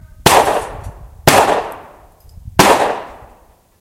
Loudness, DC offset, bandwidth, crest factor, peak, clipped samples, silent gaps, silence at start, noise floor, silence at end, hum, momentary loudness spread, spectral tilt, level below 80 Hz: -13 LUFS; under 0.1%; over 20 kHz; 16 dB; 0 dBFS; 0.2%; none; 0.25 s; -48 dBFS; 0.65 s; none; 23 LU; -3.5 dB/octave; -38 dBFS